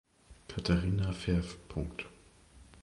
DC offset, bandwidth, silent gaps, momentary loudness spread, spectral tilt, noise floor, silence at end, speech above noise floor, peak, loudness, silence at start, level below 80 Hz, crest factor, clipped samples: under 0.1%; 11.5 kHz; none; 15 LU; -6.5 dB/octave; -58 dBFS; 0 s; 26 dB; -14 dBFS; -35 LUFS; 0.3 s; -44 dBFS; 22 dB; under 0.1%